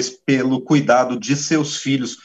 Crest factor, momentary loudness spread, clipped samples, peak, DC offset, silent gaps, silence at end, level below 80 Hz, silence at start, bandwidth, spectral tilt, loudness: 16 dB; 6 LU; under 0.1%; -2 dBFS; under 0.1%; none; 0.1 s; -66 dBFS; 0 s; 8.4 kHz; -4.5 dB/octave; -18 LUFS